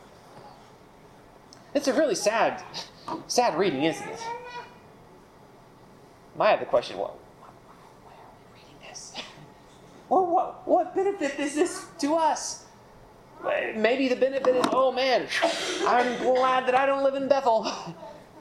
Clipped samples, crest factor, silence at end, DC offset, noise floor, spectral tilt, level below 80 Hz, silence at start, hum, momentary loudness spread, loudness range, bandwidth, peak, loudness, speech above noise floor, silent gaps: under 0.1%; 20 dB; 0 s; under 0.1%; -52 dBFS; -3.5 dB/octave; -64 dBFS; 0.3 s; none; 16 LU; 7 LU; 13.5 kHz; -6 dBFS; -25 LUFS; 27 dB; none